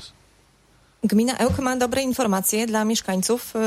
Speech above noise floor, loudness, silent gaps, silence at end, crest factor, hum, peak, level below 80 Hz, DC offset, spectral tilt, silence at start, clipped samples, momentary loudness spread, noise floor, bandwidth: 36 dB; -22 LUFS; none; 0 s; 16 dB; none; -8 dBFS; -48 dBFS; under 0.1%; -4 dB/octave; 0 s; under 0.1%; 2 LU; -57 dBFS; 16 kHz